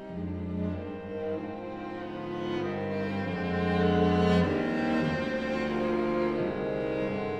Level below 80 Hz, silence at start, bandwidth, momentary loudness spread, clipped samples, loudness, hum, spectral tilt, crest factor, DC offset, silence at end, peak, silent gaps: -56 dBFS; 0 s; 8.2 kHz; 12 LU; under 0.1%; -30 LUFS; none; -8 dB/octave; 16 dB; under 0.1%; 0 s; -12 dBFS; none